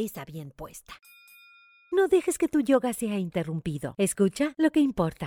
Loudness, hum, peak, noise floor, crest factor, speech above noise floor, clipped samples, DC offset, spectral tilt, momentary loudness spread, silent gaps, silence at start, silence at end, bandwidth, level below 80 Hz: -26 LUFS; none; -10 dBFS; -56 dBFS; 16 dB; 30 dB; under 0.1%; under 0.1%; -5.5 dB/octave; 18 LU; none; 0 s; 0 s; 18.5 kHz; -56 dBFS